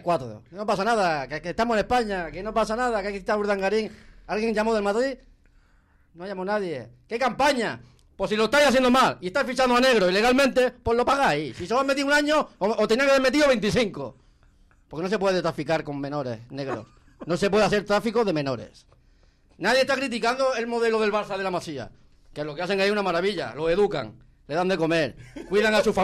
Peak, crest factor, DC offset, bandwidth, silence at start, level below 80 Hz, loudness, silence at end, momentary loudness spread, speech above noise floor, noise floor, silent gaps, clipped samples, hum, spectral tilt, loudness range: -10 dBFS; 14 dB; under 0.1%; 15.5 kHz; 0.05 s; -50 dBFS; -24 LUFS; 0 s; 14 LU; 36 dB; -60 dBFS; none; under 0.1%; none; -4.5 dB/octave; 7 LU